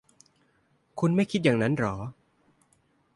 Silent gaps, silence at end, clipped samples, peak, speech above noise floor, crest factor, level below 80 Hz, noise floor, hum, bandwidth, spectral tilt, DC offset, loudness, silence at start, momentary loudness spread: none; 1.05 s; under 0.1%; -10 dBFS; 43 dB; 20 dB; -60 dBFS; -68 dBFS; none; 11.5 kHz; -7 dB/octave; under 0.1%; -26 LUFS; 0.95 s; 16 LU